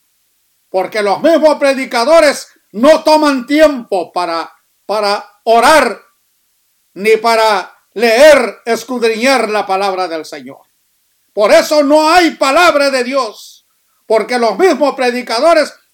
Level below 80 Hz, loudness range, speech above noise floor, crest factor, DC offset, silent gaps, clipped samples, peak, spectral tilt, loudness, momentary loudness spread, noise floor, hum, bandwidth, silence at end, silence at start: -50 dBFS; 3 LU; 48 dB; 12 dB; under 0.1%; none; 0.2%; 0 dBFS; -3 dB/octave; -11 LUFS; 12 LU; -59 dBFS; none; 17.5 kHz; 0.2 s; 0.75 s